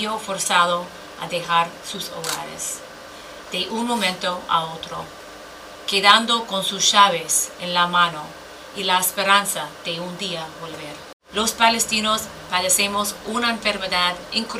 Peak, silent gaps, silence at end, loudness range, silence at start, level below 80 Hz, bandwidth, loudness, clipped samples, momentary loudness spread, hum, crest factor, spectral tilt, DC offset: 0 dBFS; 11.13-11.20 s; 0 s; 7 LU; 0 s; -56 dBFS; 15.5 kHz; -20 LUFS; under 0.1%; 19 LU; none; 22 dB; -1.5 dB/octave; under 0.1%